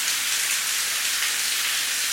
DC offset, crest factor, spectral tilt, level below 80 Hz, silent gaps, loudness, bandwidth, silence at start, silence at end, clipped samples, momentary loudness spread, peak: under 0.1%; 16 dB; 3.5 dB/octave; -64 dBFS; none; -21 LUFS; 17 kHz; 0 s; 0 s; under 0.1%; 1 LU; -8 dBFS